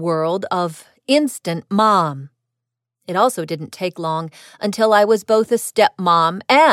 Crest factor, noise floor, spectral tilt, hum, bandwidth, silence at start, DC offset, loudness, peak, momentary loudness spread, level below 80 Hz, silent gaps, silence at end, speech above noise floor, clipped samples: 16 dB; -82 dBFS; -4.5 dB/octave; none; 16 kHz; 0 s; under 0.1%; -18 LUFS; -2 dBFS; 12 LU; -66 dBFS; none; 0 s; 64 dB; under 0.1%